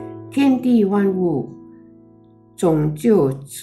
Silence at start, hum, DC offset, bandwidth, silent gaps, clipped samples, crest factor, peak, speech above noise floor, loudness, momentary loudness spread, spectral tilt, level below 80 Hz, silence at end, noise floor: 0 s; none; under 0.1%; 13.5 kHz; none; under 0.1%; 14 dB; -4 dBFS; 32 dB; -18 LUFS; 8 LU; -7.5 dB/octave; -52 dBFS; 0 s; -49 dBFS